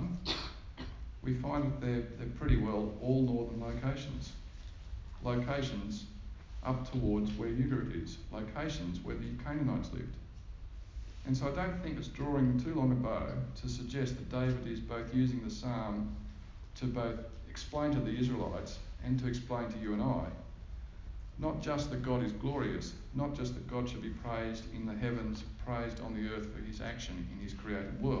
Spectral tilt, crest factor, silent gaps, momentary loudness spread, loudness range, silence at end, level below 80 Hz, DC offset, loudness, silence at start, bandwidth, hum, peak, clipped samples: -7 dB/octave; 20 dB; none; 15 LU; 4 LU; 0 s; -46 dBFS; under 0.1%; -37 LUFS; 0 s; 7.6 kHz; none; -18 dBFS; under 0.1%